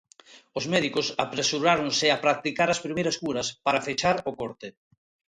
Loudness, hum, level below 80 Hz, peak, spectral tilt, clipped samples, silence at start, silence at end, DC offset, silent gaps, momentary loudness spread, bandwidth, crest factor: -25 LUFS; none; -62 dBFS; -6 dBFS; -3 dB/octave; under 0.1%; 0.3 s; 0.7 s; under 0.1%; none; 13 LU; 11.5 kHz; 20 dB